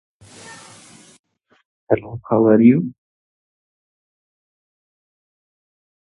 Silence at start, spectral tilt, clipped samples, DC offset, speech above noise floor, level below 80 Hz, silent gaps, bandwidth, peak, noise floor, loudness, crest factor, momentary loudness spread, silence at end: 0.5 s; -8.5 dB/octave; under 0.1%; under 0.1%; 31 dB; -56 dBFS; 1.19-1.24 s, 1.65-1.87 s; 11.5 kHz; 0 dBFS; -46 dBFS; -16 LUFS; 22 dB; 27 LU; 3.1 s